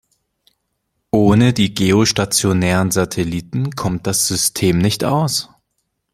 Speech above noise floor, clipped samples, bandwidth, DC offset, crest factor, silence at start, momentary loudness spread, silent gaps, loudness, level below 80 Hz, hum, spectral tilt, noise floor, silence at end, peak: 56 dB; under 0.1%; 16.5 kHz; under 0.1%; 16 dB; 1.15 s; 8 LU; none; -16 LUFS; -44 dBFS; none; -4.5 dB/octave; -71 dBFS; 0.7 s; 0 dBFS